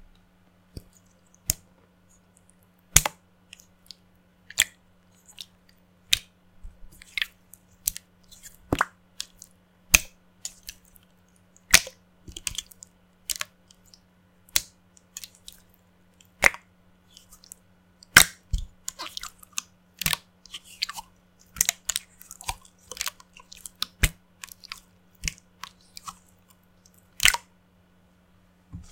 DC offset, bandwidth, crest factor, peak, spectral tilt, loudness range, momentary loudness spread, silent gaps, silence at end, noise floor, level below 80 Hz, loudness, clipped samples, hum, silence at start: under 0.1%; 17 kHz; 32 dB; 0 dBFS; -0.5 dB/octave; 9 LU; 27 LU; none; 0.1 s; -60 dBFS; -44 dBFS; -25 LUFS; under 0.1%; none; 1.5 s